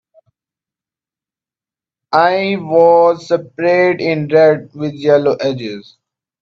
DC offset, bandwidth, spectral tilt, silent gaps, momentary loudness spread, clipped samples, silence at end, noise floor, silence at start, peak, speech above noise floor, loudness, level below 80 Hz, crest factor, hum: under 0.1%; 7.2 kHz; -7 dB/octave; none; 10 LU; under 0.1%; 0.6 s; -90 dBFS; 2.1 s; 0 dBFS; 77 dB; -13 LUFS; -62 dBFS; 14 dB; none